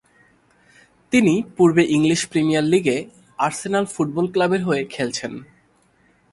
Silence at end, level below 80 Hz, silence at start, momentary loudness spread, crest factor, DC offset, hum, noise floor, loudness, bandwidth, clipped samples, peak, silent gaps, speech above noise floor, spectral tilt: 0.9 s; -58 dBFS; 1.1 s; 9 LU; 18 dB; under 0.1%; none; -59 dBFS; -20 LUFS; 11.5 kHz; under 0.1%; -2 dBFS; none; 40 dB; -5.5 dB/octave